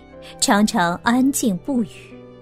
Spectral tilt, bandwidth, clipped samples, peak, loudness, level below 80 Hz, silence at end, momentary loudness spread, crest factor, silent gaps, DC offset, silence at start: -4 dB/octave; 16 kHz; under 0.1%; -2 dBFS; -19 LUFS; -50 dBFS; 0.1 s; 7 LU; 18 dB; none; under 0.1%; 0.15 s